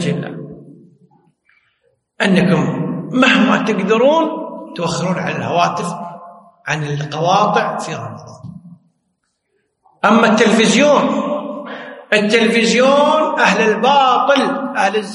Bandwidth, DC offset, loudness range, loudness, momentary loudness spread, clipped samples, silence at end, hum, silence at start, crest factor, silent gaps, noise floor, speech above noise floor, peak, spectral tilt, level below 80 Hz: 11.5 kHz; under 0.1%; 7 LU; -14 LUFS; 17 LU; under 0.1%; 0 s; none; 0 s; 16 dB; none; -69 dBFS; 55 dB; 0 dBFS; -5 dB/octave; -60 dBFS